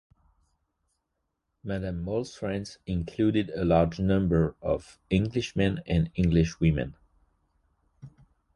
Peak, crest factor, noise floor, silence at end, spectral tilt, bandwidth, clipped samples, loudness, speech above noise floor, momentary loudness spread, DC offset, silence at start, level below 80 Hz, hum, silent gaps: -8 dBFS; 20 dB; -80 dBFS; 0.45 s; -7.5 dB/octave; 10.5 kHz; under 0.1%; -28 LUFS; 54 dB; 9 LU; under 0.1%; 1.65 s; -42 dBFS; none; none